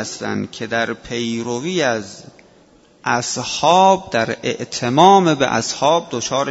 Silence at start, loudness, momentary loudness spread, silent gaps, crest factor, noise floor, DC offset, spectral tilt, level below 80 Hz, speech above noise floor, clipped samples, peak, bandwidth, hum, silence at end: 0 s; -17 LUFS; 12 LU; none; 18 dB; -50 dBFS; under 0.1%; -4 dB/octave; -54 dBFS; 33 dB; under 0.1%; 0 dBFS; 8 kHz; none; 0 s